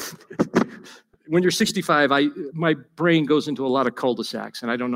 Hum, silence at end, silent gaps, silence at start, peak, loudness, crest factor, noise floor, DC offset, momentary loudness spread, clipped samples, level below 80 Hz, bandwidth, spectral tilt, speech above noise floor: none; 0 s; none; 0 s; -4 dBFS; -22 LUFS; 18 dB; -47 dBFS; under 0.1%; 9 LU; under 0.1%; -64 dBFS; 16 kHz; -5 dB/octave; 26 dB